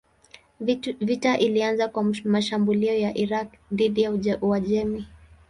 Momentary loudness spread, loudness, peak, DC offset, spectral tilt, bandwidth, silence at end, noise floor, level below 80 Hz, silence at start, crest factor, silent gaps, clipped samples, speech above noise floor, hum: 8 LU; -24 LUFS; -6 dBFS; under 0.1%; -6 dB/octave; 11 kHz; 0.35 s; -53 dBFS; -54 dBFS; 0.6 s; 18 dB; none; under 0.1%; 30 dB; none